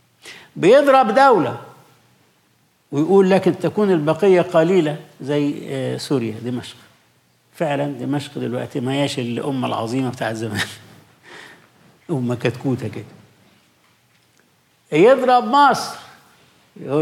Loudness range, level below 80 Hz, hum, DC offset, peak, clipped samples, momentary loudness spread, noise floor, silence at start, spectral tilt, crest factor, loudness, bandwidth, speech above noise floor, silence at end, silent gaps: 9 LU; -70 dBFS; none; under 0.1%; -4 dBFS; under 0.1%; 17 LU; -60 dBFS; 0.25 s; -6 dB/octave; 16 dB; -18 LUFS; 15 kHz; 43 dB; 0 s; none